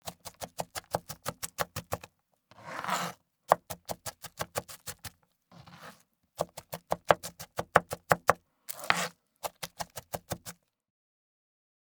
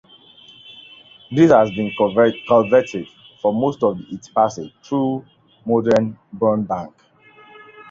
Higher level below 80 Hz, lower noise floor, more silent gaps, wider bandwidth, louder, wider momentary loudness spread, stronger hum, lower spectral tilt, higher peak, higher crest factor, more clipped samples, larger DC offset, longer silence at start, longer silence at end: second, -64 dBFS vs -56 dBFS; first, -65 dBFS vs -48 dBFS; neither; first, over 20 kHz vs 7.6 kHz; second, -34 LUFS vs -18 LUFS; about the same, 19 LU vs 19 LU; neither; second, -3 dB/octave vs -7 dB/octave; about the same, -2 dBFS vs -2 dBFS; first, 34 dB vs 18 dB; neither; neither; second, 0.05 s vs 0.7 s; first, 1.4 s vs 0.1 s